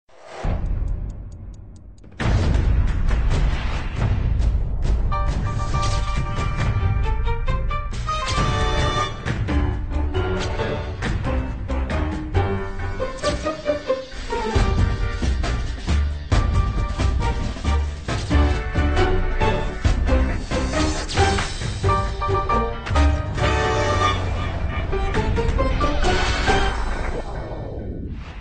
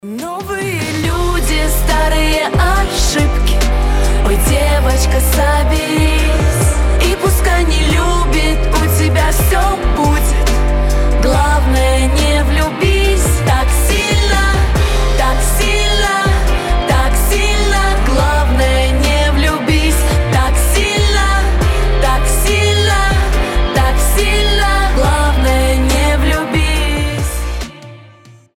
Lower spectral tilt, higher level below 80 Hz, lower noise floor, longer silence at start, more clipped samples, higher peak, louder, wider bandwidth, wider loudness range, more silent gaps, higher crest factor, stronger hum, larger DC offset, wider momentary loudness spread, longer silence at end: about the same, -5.5 dB/octave vs -4.5 dB/octave; second, -24 dBFS vs -14 dBFS; about the same, -41 dBFS vs -41 dBFS; first, 0.25 s vs 0.05 s; neither; second, -6 dBFS vs -2 dBFS; second, -23 LUFS vs -13 LUFS; second, 9.4 kHz vs 16.5 kHz; about the same, 3 LU vs 1 LU; neither; about the same, 14 dB vs 10 dB; neither; first, 0.5% vs under 0.1%; first, 7 LU vs 3 LU; second, 0 s vs 0.55 s